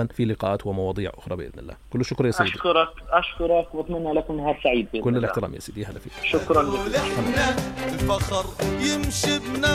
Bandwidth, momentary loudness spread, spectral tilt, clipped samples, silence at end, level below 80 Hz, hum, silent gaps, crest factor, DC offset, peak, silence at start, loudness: 16 kHz; 11 LU; -5 dB/octave; under 0.1%; 0 s; -40 dBFS; none; none; 20 dB; under 0.1%; -4 dBFS; 0 s; -24 LUFS